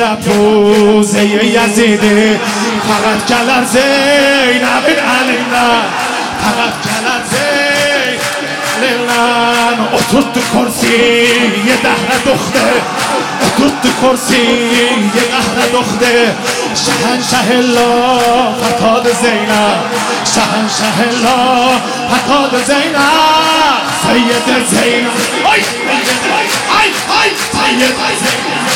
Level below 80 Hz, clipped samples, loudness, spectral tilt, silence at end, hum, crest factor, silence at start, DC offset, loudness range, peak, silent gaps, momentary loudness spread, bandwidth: -44 dBFS; under 0.1%; -10 LUFS; -3 dB/octave; 0 s; none; 10 dB; 0 s; under 0.1%; 2 LU; 0 dBFS; none; 5 LU; 17.5 kHz